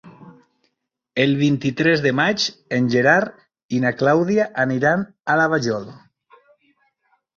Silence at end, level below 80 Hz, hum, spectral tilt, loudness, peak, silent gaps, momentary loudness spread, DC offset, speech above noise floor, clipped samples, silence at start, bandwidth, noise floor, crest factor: 1.4 s; -60 dBFS; none; -5.5 dB/octave; -19 LUFS; -2 dBFS; 3.64-3.69 s; 9 LU; under 0.1%; 57 dB; under 0.1%; 0.05 s; 7.4 kHz; -75 dBFS; 18 dB